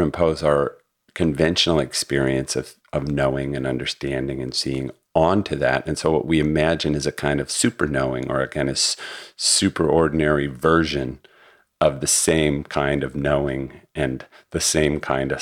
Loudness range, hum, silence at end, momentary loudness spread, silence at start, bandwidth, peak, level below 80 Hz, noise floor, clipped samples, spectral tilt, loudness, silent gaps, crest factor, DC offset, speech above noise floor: 3 LU; none; 0 s; 9 LU; 0 s; 16.5 kHz; -2 dBFS; -40 dBFS; -54 dBFS; under 0.1%; -4 dB/octave; -21 LUFS; none; 18 dB; under 0.1%; 33 dB